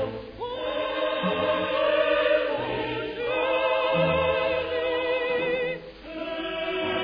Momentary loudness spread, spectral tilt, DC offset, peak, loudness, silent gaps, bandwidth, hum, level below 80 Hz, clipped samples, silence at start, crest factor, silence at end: 10 LU; -7.5 dB/octave; under 0.1%; -12 dBFS; -26 LUFS; none; 5.2 kHz; none; -52 dBFS; under 0.1%; 0 s; 14 dB; 0 s